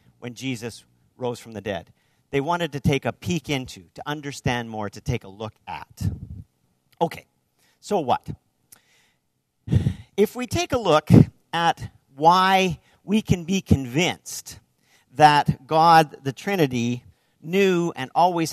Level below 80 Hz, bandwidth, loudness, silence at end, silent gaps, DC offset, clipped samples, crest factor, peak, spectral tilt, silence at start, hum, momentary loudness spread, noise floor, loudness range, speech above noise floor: -46 dBFS; 14 kHz; -22 LUFS; 0 s; none; under 0.1%; under 0.1%; 22 dB; -2 dBFS; -5.5 dB/octave; 0.2 s; none; 21 LU; -72 dBFS; 11 LU; 51 dB